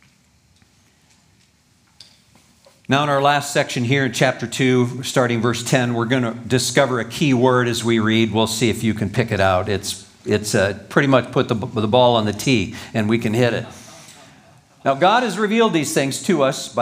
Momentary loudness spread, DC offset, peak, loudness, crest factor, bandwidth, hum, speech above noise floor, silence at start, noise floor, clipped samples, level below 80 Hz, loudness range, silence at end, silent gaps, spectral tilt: 6 LU; under 0.1%; 0 dBFS; -18 LUFS; 18 dB; 16 kHz; none; 39 dB; 2.9 s; -57 dBFS; under 0.1%; -56 dBFS; 3 LU; 0 s; none; -5 dB/octave